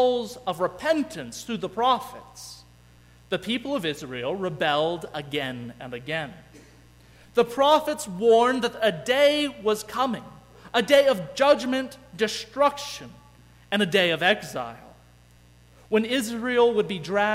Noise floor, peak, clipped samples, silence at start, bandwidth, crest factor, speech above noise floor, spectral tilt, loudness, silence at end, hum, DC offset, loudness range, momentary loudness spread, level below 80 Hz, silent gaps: -54 dBFS; -6 dBFS; under 0.1%; 0 s; 16 kHz; 18 dB; 30 dB; -4 dB/octave; -24 LUFS; 0 s; 60 Hz at -55 dBFS; under 0.1%; 7 LU; 15 LU; -58 dBFS; none